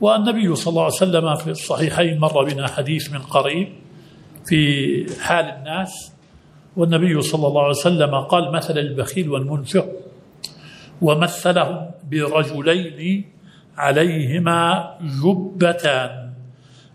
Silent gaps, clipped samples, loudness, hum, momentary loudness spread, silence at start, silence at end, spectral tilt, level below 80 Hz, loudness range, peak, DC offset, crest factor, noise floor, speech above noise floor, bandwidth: none; under 0.1%; -19 LUFS; none; 12 LU; 0 s; 0.45 s; -5.5 dB/octave; -58 dBFS; 2 LU; 0 dBFS; under 0.1%; 18 dB; -48 dBFS; 30 dB; 15 kHz